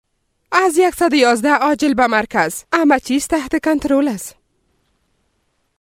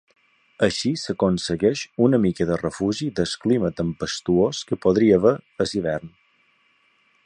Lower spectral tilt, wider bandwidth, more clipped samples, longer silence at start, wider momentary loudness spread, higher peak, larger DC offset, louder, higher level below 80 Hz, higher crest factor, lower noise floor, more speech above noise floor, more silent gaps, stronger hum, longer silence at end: second, -3.5 dB/octave vs -6 dB/octave; first, 16.5 kHz vs 10.5 kHz; neither; about the same, 0.5 s vs 0.6 s; second, 5 LU vs 8 LU; about the same, -2 dBFS vs -4 dBFS; neither; first, -15 LUFS vs -22 LUFS; about the same, -48 dBFS vs -50 dBFS; about the same, 16 dB vs 18 dB; about the same, -66 dBFS vs -63 dBFS; first, 51 dB vs 41 dB; neither; neither; first, 1.55 s vs 1.2 s